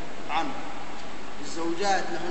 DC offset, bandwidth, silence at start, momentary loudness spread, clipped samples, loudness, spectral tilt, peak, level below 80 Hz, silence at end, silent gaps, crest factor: 5%; 8.4 kHz; 0 s; 13 LU; under 0.1%; -31 LUFS; -3.5 dB/octave; -12 dBFS; -56 dBFS; 0 s; none; 18 dB